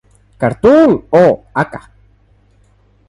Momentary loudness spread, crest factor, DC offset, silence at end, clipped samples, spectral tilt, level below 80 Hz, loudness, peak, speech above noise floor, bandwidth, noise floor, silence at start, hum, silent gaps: 11 LU; 14 dB; under 0.1%; 1.3 s; under 0.1%; -8 dB/octave; -44 dBFS; -12 LUFS; 0 dBFS; 40 dB; 11 kHz; -51 dBFS; 0.4 s; 50 Hz at -45 dBFS; none